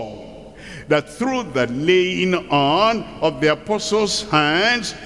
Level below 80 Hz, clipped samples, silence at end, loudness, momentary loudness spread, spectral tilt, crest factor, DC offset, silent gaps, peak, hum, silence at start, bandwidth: -48 dBFS; under 0.1%; 0 s; -18 LUFS; 18 LU; -4 dB/octave; 16 dB; 0.2%; none; -2 dBFS; none; 0 s; 12 kHz